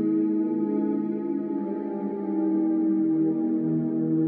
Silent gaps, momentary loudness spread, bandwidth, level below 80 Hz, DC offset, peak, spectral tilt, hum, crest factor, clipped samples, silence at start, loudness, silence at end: none; 6 LU; 2.5 kHz; -86 dBFS; under 0.1%; -14 dBFS; -12 dB/octave; none; 10 dB; under 0.1%; 0 s; -26 LUFS; 0 s